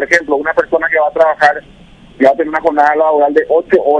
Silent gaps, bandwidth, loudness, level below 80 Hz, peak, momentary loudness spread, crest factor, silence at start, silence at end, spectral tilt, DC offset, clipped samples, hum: none; 11 kHz; -12 LUFS; -48 dBFS; 0 dBFS; 4 LU; 12 dB; 0 s; 0 s; -4.5 dB/octave; under 0.1%; 0.6%; none